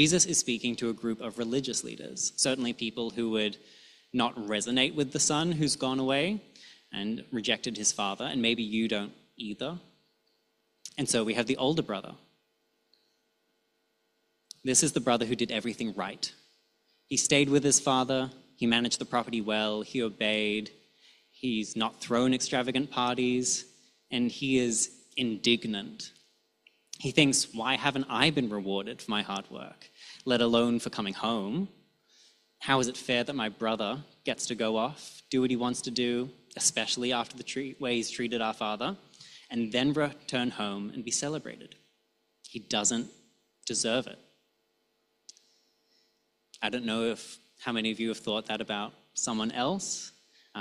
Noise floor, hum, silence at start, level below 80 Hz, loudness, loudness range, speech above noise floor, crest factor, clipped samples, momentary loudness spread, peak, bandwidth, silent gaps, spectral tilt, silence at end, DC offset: -76 dBFS; none; 0 s; -68 dBFS; -29 LUFS; 5 LU; 46 dB; 24 dB; under 0.1%; 13 LU; -6 dBFS; 13 kHz; none; -3 dB/octave; 0 s; under 0.1%